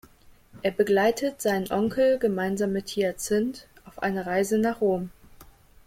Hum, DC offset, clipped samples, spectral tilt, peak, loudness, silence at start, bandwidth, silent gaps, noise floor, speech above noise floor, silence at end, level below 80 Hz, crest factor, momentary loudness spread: none; under 0.1%; under 0.1%; -5 dB/octave; -10 dBFS; -26 LUFS; 0.55 s; 16.5 kHz; none; -54 dBFS; 29 dB; 0.45 s; -56 dBFS; 16 dB; 9 LU